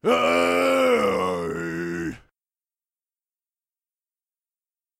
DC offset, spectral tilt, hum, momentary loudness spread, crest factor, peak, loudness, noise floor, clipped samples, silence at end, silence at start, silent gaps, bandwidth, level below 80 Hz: under 0.1%; -4.5 dB/octave; none; 10 LU; 18 dB; -8 dBFS; -22 LUFS; under -90 dBFS; under 0.1%; 2.85 s; 0.05 s; none; 16 kHz; -58 dBFS